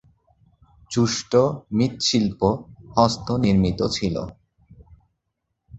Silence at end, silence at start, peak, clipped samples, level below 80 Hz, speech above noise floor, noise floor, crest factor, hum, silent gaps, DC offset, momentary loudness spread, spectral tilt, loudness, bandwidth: 0 s; 0.9 s; -2 dBFS; under 0.1%; -44 dBFS; 57 dB; -78 dBFS; 22 dB; none; none; under 0.1%; 8 LU; -5.5 dB/octave; -22 LUFS; 8.2 kHz